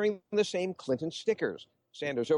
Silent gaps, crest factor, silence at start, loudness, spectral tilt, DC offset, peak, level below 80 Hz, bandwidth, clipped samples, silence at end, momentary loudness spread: none; 16 dB; 0 s; -32 LUFS; -5 dB/octave; under 0.1%; -16 dBFS; -74 dBFS; 11 kHz; under 0.1%; 0 s; 9 LU